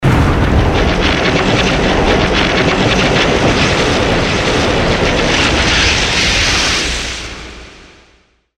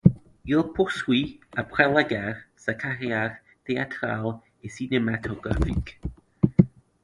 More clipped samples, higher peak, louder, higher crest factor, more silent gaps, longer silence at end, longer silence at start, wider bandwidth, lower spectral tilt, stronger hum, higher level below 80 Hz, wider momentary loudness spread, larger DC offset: neither; about the same, 0 dBFS vs 0 dBFS; first, -12 LUFS vs -26 LUFS; second, 12 dB vs 24 dB; neither; first, 0.8 s vs 0.35 s; about the same, 0 s vs 0.05 s; first, 15 kHz vs 11.5 kHz; second, -4 dB/octave vs -7 dB/octave; neither; first, -22 dBFS vs -40 dBFS; second, 3 LU vs 15 LU; neither